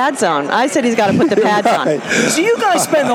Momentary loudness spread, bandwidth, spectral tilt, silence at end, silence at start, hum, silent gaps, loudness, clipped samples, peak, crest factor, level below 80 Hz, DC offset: 2 LU; over 20 kHz; -3.5 dB/octave; 0 s; 0 s; none; none; -14 LUFS; under 0.1%; -2 dBFS; 12 dB; -58 dBFS; under 0.1%